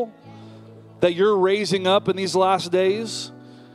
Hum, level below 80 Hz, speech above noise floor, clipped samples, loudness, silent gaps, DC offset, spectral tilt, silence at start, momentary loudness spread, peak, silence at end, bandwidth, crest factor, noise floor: none; -64 dBFS; 24 dB; under 0.1%; -20 LUFS; none; under 0.1%; -4.5 dB/octave; 0 s; 12 LU; -4 dBFS; 0.2 s; 12.5 kHz; 16 dB; -44 dBFS